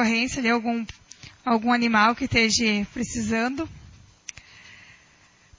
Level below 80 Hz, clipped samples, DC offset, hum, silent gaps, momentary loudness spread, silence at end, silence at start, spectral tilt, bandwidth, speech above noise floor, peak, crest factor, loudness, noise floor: -50 dBFS; under 0.1%; under 0.1%; none; none; 21 LU; 0.85 s; 0 s; -3.5 dB/octave; 7.6 kHz; 34 dB; -6 dBFS; 20 dB; -23 LUFS; -57 dBFS